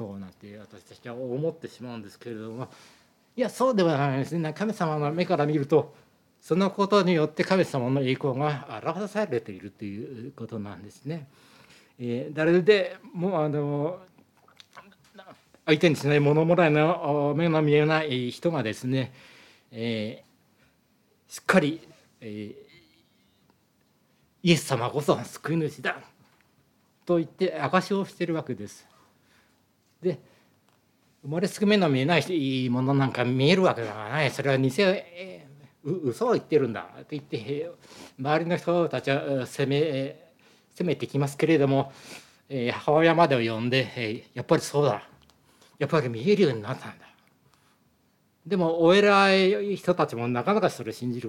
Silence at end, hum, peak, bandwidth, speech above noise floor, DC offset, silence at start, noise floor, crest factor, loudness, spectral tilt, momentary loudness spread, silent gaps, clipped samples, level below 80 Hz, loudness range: 0 s; none; -6 dBFS; 16 kHz; 42 dB; under 0.1%; 0 s; -67 dBFS; 20 dB; -25 LUFS; -6 dB/octave; 18 LU; none; under 0.1%; -74 dBFS; 8 LU